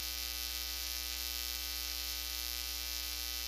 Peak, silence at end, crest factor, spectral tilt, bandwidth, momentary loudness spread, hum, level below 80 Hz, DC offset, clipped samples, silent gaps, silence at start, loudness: -18 dBFS; 0 s; 22 dB; 0 dB/octave; 15.5 kHz; 0 LU; 60 Hz at -50 dBFS; -50 dBFS; under 0.1%; under 0.1%; none; 0 s; -37 LUFS